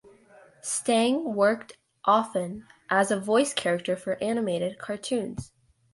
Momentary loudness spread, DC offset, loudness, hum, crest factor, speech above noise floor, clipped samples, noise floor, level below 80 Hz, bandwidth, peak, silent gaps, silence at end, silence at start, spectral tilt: 11 LU; under 0.1%; -26 LUFS; none; 20 dB; 29 dB; under 0.1%; -55 dBFS; -62 dBFS; 11.5 kHz; -8 dBFS; none; 0.5 s; 0.65 s; -4 dB/octave